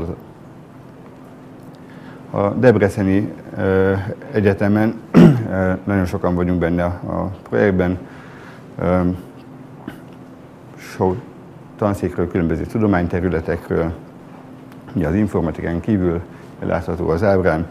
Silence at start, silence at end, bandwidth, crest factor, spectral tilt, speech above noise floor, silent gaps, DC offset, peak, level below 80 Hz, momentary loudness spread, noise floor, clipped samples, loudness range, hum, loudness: 0 s; 0 s; 14 kHz; 18 dB; -8.5 dB/octave; 22 dB; none; under 0.1%; 0 dBFS; -44 dBFS; 23 LU; -40 dBFS; under 0.1%; 8 LU; none; -18 LUFS